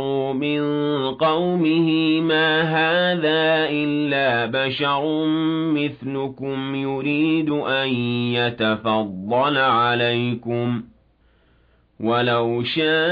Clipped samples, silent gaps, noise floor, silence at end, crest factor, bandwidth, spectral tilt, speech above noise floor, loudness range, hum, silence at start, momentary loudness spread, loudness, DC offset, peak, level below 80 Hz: under 0.1%; none; -58 dBFS; 0 s; 12 dB; 5 kHz; -8.5 dB/octave; 38 dB; 3 LU; none; 0 s; 7 LU; -20 LUFS; under 0.1%; -8 dBFS; -60 dBFS